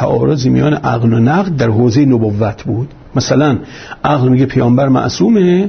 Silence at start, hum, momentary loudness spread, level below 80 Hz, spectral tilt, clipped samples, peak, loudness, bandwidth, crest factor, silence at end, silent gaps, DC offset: 0 s; none; 9 LU; -40 dBFS; -7 dB/octave; under 0.1%; 0 dBFS; -12 LUFS; 6.6 kHz; 10 dB; 0 s; none; under 0.1%